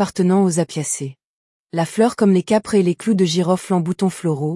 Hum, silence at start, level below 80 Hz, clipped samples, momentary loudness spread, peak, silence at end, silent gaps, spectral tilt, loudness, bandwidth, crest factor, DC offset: none; 0 s; -62 dBFS; under 0.1%; 8 LU; -4 dBFS; 0 s; 1.24-1.65 s; -6 dB/octave; -18 LUFS; 12 kHz; 14 dB; under 0.1%